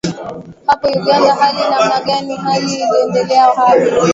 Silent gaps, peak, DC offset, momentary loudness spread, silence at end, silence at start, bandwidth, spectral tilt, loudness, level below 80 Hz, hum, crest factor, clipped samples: none; 0 dBFS; under 0.1%; 8 LU; 0 s; 0.05 s; 8 kHz; -4.5 dB/octave; -13 LUFS; -52 dBFS; none; 12 dB; under 0.1%